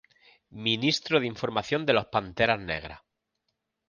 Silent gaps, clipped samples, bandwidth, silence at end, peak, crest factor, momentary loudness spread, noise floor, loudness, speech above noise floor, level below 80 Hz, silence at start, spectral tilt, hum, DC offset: none; under 0.1%; 10 kHz; 0.9 s; -8 dBFS; 22 dB; 8 LU; -81 dBFS; -27 LUFS; 53 dB; -56 dBFS; 0.5 s; -4.5 dB/octave; none; under 0.1%